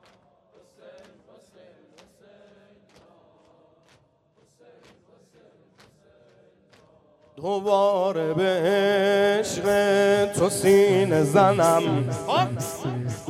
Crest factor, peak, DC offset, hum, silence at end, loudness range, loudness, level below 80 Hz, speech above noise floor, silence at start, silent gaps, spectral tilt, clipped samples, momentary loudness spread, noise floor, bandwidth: 20 dB; -4 dBFS; under 0.1%; none; 0 s; 9 LU; -21 LUFS; -62 dBFS; 42 dB; 0.85 s; none; -5 dB/octave; under 0.1%; 10 LU; -63 dBFS; 16 kHz